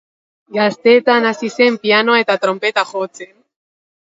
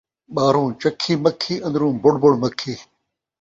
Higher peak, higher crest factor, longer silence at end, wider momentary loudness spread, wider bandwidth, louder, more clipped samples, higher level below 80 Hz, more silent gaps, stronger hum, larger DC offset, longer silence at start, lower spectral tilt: about the same, 0 dBFS vs -2 dBFS; about the same, 16 dB vs 18 dB; first, 0.9 s vs 0.6 s; about the same, 11 LU vs 13 LU; about the same, 7.8 kHz vs 7.8 kHz; first, -14 LUFS vs -19 LUFS; neither; second, -70 dBFS vs -58 dBFS; neither; neither; neither; first, 0.5 s vs 0.3 s; second, -4 dB/octave vs -6 dB/octave